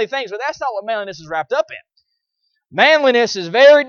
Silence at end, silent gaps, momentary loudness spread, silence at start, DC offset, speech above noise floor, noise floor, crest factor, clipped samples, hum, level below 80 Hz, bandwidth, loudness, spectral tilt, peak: 0 s; none; 14 LU; 0 s; under 0.1%; 56 dB; -71 dBFS; 16 dB; under 0.1%; none; -64 dBFS; 7 kHz; -16 LUFS; -3 dB/octave; 0 dBFS